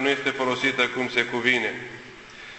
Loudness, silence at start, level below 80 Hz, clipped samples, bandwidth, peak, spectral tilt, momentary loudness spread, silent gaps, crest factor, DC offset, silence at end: -23 LUFS; 0 s; -62 dBFS; under 0.1%; 8.4 kHz; -4 dBFS; -3.5 dB/octave; 19 LU; none; 22 dB; under 0.1%; 0 s